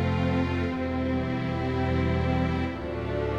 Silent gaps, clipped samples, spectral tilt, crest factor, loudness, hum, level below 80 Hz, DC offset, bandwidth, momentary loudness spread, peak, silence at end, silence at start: none; under 0.1%; -8.5 dB/octave; 12 dB; -28 LUFS; none; -38 dBFS; 0.1%; 7.6 kHz; 4 LU; -14 dBFS; 0 s; 0 s